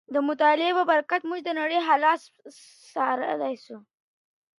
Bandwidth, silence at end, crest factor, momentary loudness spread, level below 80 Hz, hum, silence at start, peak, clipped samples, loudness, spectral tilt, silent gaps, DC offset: 11.5 kHz; 0.8 s; 18 dB; 9 LU; -86 dBFS; none; 0.1 s; -8 dBFS; under 0.1%; -24 LUFS; -3.5 dB/octave; none; under 0.1%